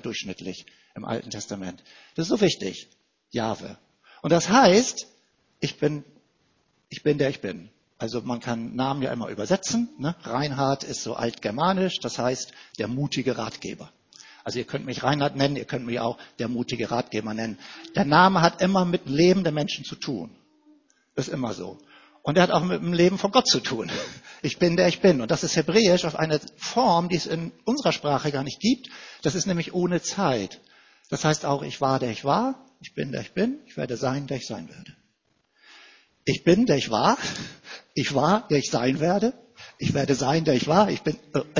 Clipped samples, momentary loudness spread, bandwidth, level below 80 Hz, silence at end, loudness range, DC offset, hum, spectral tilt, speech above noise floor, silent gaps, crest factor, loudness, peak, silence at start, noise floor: under 0.1%; 16 LU; 7.6 kHz; -58 dBFS; 0 s; 7 LU; under 0.1%; none; -5 dB/octave; 46 dB; none; 24 dB; -24 LUFS; -2 dBFS; 0.05 s; -70 dBFS